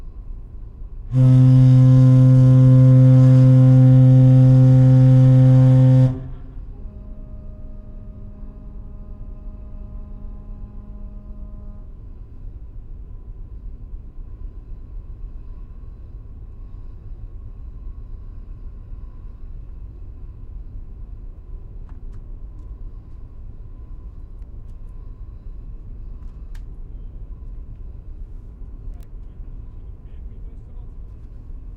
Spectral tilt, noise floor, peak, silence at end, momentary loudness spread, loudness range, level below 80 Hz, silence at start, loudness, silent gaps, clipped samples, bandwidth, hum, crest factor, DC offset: -11 dB/octave; -36 dBFS; -4 dBFS; 0 s; 28 LU; 28 LU; -34 dBFS; 0.05 s; -12 LUFS; none; under 0.1%; 3.1 kHz; none; 14 dB; under 0.1%